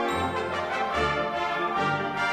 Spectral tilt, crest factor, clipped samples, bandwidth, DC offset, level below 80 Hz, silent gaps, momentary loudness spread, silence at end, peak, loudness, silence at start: -5 dB/octave; 14 dB; under 0.1%; 15 kHz; under 0.1%; -50 dBFS; none; 3 LU; 0 s; -14 dBFS; -27 LUFS; 0 s